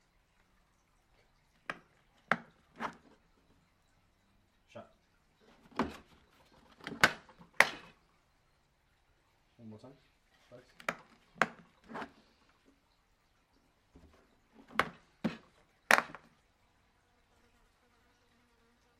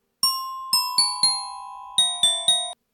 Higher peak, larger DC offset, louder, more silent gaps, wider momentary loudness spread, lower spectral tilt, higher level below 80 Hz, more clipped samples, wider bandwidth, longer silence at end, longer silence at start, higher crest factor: first, -2 dBFS vs -8 dBFS; neither; second, -34 LUFS vs -20 LUFS; neither; first, 26 LU vs 11 LU; first, -2.5 dB/octave vs 2 dB/octave; about the same, -70 dBFS vs -68 dBFS; neither; second, 15.5 kHz vs over 20 kHz; first, 2.9 s vs 0.2 s; first, 1.7 s vs 0.25 s; first, 40 dB vs 16 dB